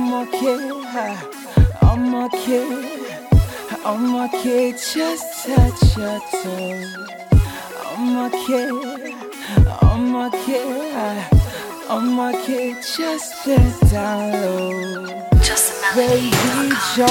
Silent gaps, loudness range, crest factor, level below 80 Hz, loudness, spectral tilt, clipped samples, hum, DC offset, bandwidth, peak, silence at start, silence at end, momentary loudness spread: none; 3 LU; 16 dB; -24 dBFS; -19 LUFS; -5.5 dB/octave; under 0.1%; none; under 0.1%; 18 kHz; -2 dBFS; 0 s; 0 s; 11 LU